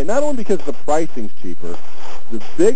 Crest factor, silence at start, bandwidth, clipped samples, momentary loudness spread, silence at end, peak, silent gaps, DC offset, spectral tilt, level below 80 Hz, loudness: 16 dB; 0 s; 8 kHz; under 0.1%; 15 LU; 0 s; 0 dBFS; none; 40%; -6 dB/octave; -50 dBFS; -23 LUFS